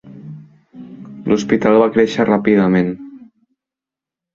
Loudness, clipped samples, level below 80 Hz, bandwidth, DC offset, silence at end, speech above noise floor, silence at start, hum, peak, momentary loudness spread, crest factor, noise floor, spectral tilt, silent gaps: -14 LUFS; under 0.1%; -52 dBFS; 7.6 kHz; under 0.1%; 1.1 s; 73 dB; 0.05 s; none; -2 dBFS; 23 LU; 16 dB; -87 dBFS; -7 dB/octave; none